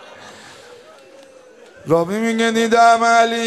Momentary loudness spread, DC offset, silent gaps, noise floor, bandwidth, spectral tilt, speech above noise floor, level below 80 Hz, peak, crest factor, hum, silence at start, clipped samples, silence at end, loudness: 8 LU; under 0.1%; none; -44 dBFS; 13.5 kHz; -4 dB/octave; 30 dB; -62 dBFS; -2 dBFS; 16 dB; none; 0.2 s; under 0.1%; 0 s; -15 LUFS